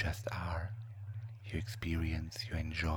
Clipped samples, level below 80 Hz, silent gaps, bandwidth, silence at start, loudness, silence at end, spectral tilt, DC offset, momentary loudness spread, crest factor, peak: under 0.1%; -46 dBFS; none; 18.5 kHz; 0 s; -40 LUFS; 0 s; -5.5 dB/octave; under 0.1%; 9 LU; 16 dB; -22 dBFS